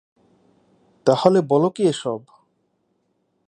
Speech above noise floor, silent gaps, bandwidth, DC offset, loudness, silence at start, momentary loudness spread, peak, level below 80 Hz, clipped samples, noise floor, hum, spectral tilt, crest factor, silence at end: 51 dB; none; 10.5 kHz; under 0.1%; -19 LUFS; 1.05 s; 12 LU; 0 dBFS; -70 dBFS; under 0.1%; -69 dBFS; none; -6.5 dB/octave; 22 dB; 1.3 s